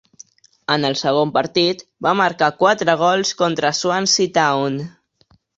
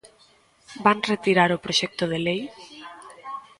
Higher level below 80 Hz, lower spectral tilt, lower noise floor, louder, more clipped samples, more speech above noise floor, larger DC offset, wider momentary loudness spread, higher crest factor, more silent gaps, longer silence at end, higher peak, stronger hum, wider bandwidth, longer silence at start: about the same, -62 dBFS vs -62 dBFS; about the same, -3.5 dB/octave vs -4.5 dB/octave; about the same, -58 dBFS vs -58 dBFS; first, -17 LUFS vs -22 LUFS; neither; first, 41 dB vs 36 dB; neither; second, 6 LU vs 22 LU; about the same, 18 dB vs 20 dB; neither; first, 0.7 s vs 0.2 s; first, 0 dBFS vs -4 dBFS; neither; second, 8 kHz vs 11.5 kHz; about the same, 0.7 s vs 0.7 s